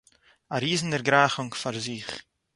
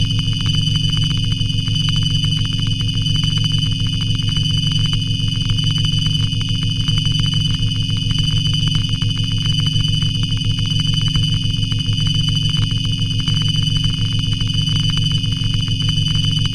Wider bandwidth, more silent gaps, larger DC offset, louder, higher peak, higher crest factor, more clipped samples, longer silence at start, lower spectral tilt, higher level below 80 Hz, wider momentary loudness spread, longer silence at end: about the same, 11.5 kHz vs 11.5 kHz; neither; neither; second, -26 LUFS vs -17 LUFS; about the same, -4 dBFS vs -4 dBFS; first, 24 dB vs 14 dB; neither; first, 0.5 s vs 0 s; about the same, -4 dB/octave vs -4.5 dB/octave; second, -64 dBFS vs -26 dBFS; first, 15 LU vs 2 LU; first, 0.35 s vs 0 s